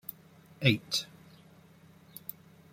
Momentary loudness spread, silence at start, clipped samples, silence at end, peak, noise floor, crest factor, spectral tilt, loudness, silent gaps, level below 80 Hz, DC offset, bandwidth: 19 LU; 0.1 s; under 0.1%; 1.65 s; -8 dBFS; -58 dBFS; 28 dB; -4.5 dB/octave; -31 LUFS; none; -70 dBFS; under 0.1%; 16.5 kHz